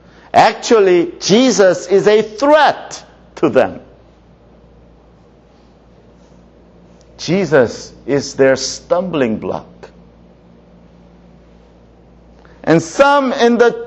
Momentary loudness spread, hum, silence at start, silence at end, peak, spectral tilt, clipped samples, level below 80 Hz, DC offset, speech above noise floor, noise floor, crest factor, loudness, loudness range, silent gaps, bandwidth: 14 LU; none; 0.35 s; 0 s; 0 dBFS; -4.5 dB/octave; under 0.1%; -50 dBFS; under 0.1%; 34 dB; -46 dBFS; 16 dB; -13 LUFS; 13 LU; none; 8.4 kHz